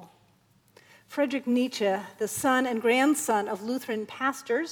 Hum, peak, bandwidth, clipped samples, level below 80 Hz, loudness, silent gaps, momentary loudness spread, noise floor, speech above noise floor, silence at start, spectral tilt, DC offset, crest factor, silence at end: none; -10 dBFS; 20 kHz; under 0.1%; -74 dBFS; -27 LUFS; none; 9 LU; -64 dBFS; 37 dB; 0 s; -3.5 dB/octave; under 0.1%; 18 dB; 0 s